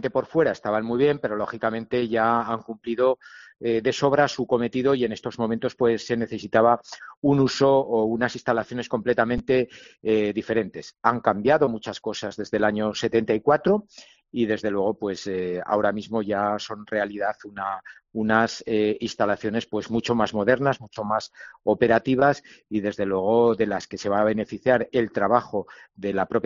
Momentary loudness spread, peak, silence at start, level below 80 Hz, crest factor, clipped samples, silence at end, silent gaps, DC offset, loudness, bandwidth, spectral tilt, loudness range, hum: 10 LU; -2 dBFS; 0 s; -54 dBFS; 20 dB; under 0.1%; 0.05 s; 7.17-7.22 s; under 0.1%; -24 LUFS; 7.4 kHz; -4.5 dB/octave; 3 LU; none